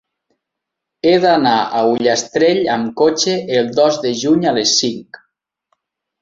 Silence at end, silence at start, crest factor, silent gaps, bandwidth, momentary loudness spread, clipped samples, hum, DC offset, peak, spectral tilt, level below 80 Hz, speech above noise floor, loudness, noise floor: 1.05 s; 1.05 s; 14 dB; none; 7.8 kHz; 5 LU; under 0.1%; none; under 0.1%; -2 dBFS; -3.5 dB/octave; -58 dBFS; 66 dB; -14 LUFS; -80 dBFS